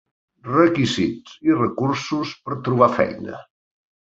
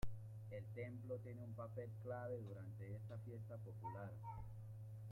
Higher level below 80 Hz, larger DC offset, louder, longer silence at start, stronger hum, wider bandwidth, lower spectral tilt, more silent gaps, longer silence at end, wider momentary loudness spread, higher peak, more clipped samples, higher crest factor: first, -54 dBFS vs -64 dBFS; neither; first, -20 LUFS vs -52 LUFS; first, 0.45 s vs 0 s; neither; second, 8 kHz vs 15 kHz; second, -6 dB/octave vs -8.5 dB/octave; neither; first, 0.75 s vs 0 s; first, 15 LU vs 5 LU; first, -2 dBFS vs -32 dBFS; neither; about the same, 20 dB vs 18 dB